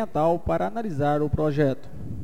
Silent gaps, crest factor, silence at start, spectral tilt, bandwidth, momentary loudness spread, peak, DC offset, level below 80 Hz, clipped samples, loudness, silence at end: none; 16 dB; 0 s; -8.5 dB/octave; 15.5 kHz; 7 LU; -10 dBFS; 2%; -42 dBFS; under 0.1%; -25 LUFS; 0 s